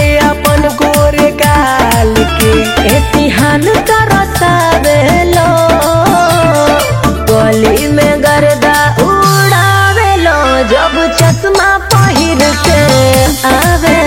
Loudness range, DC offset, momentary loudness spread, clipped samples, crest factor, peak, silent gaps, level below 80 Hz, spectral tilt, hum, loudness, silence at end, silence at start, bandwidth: 1 LU; under 0.1%; 2 LU; 0.6%; 8 dB; 0 dBFS; none; -20 dBFS; -4.5 dB/octave; none; -8 LUFS; 0 s; 0 s; over 20 kHz